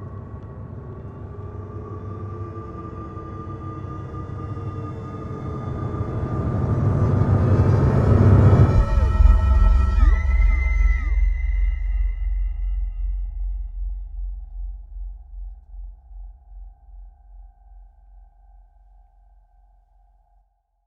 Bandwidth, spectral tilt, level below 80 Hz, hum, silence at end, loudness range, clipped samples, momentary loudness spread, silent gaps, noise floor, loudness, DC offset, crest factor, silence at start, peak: 5.8 kHz; -9.5 dB/octave; -24 dBFS; none; 2.65 s; 20 LU; under 0.1%; 20 LU; none; -63 dBFS; -22 LUFS; under 0.1%; 18 dB; 0 s; -2 dBFS